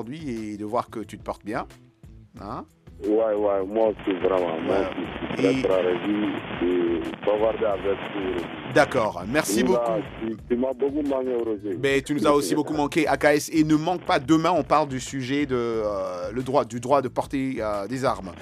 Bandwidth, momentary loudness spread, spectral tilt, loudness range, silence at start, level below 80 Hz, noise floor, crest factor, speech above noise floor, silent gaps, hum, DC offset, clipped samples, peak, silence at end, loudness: 15.5 kHz; 11 LU; -5.5 dB/octave; 4 LU; 0 s; -50 dBFS; -48 dBFS; 18 dB; 24 dB; none; none; under 0.1%; under 0.1%; -6 dBFS; 0 s; -24 LUFS